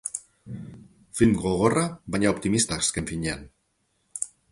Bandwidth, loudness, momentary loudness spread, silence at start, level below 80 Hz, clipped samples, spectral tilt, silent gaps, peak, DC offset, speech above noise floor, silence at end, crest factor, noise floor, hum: 11.5 kHz; -25 LUFS; 18 LU; 0.05 s; -48 dBFS; under 0.1%; -4.5 dB/octave; none; -6 dBFS; under 0.1%; 48 dB; 0.25 s; 22 dB; -72 dBFS; none